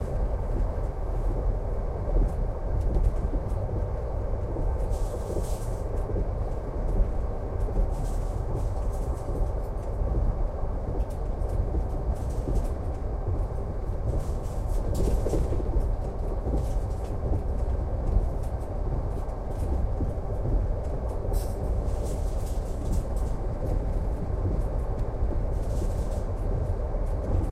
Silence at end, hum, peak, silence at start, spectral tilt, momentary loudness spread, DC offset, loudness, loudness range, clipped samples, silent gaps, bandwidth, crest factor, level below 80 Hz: 0 s; none; -10 dBFS; 0 s; -8 dB/octave; 4 LU; under 0.1%; -31 LUFS; 1 LU; under 0.1%; none; 12.5 kHz; 16 dB; -28 dBFS